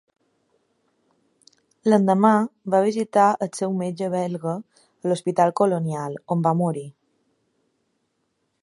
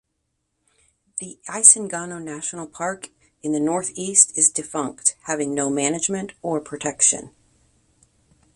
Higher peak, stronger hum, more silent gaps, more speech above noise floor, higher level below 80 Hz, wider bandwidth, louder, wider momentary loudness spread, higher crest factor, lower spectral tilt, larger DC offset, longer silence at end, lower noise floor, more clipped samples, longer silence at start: about the same, -2 dBFS vs 0 dBFS; neither; neither; about the same, 52 dB vs 53 dB; second, -72 dBFS vs -64 dBFS; about the same, 11.5 kHz vs 12.5 kHz; second, -22 LUFS vs -19 LUFS; second, 12 LU vs 19 LU; about the same, 20 dB vs 24 dB; first, -7 dB/octave vs -2.5 dB/octave; neither; first, 1.7 s vs 1.25 s; about the same, -73 dBFS vs -75 dBFS; neither; first, 1.85 s vs 1.15 s